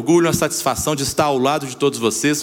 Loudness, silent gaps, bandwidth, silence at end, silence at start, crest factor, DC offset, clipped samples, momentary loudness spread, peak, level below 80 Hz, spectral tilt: -18 LUFS; none; 17 kHz; 0 s; 0 s; 16 dB; under 0.1%; under 0.1%; 4 LU; -2 dBFS; -46 dBFS; -4 dB/octave